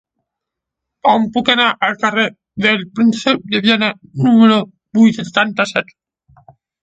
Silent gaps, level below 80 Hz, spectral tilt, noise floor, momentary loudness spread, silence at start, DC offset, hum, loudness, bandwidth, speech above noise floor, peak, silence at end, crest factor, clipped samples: none; -58 dBFS; -5 dB/octave; -81 dBFS; 7 LU; 1.05 s; under 0.1%; none; -14 LUFS; 8 kHz; 67 dB; 0 dBFS; 1 s; 16 dB; under 0.1%